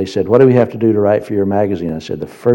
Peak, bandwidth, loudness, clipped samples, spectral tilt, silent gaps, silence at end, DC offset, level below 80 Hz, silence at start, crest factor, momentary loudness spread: 0 dBFS; 16.5 kHz; -14 LUFS; 0.3%; -8.5 dB/octave; none; 0 s; under 0.1%; -48 dBFS; 0 s; 14 dB; 12 LU